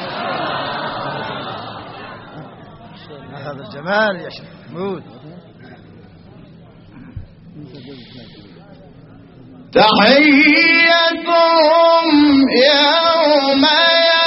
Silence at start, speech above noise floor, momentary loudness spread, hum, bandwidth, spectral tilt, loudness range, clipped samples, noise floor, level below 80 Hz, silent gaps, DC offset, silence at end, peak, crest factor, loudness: 0 s; 28 dB; 23 LU; none; 6 kHz; -1 dB/octave; 18 LU; under 0.1%; -41 dBFS; -52 dBFS; none; under 0.1%; 0 s; 0 dBFS; 16 dB; -12 LUFS